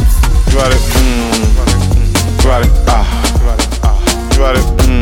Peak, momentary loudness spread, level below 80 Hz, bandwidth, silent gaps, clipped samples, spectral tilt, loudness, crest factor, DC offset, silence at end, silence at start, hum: 0 dBFS; 2 LU; -10 dBFS; 16.5 kHz; none; under 0.1%; -5 dB/octave; -12 LUFS; 8 dB; under 0.1%; 0 s; 0 s; none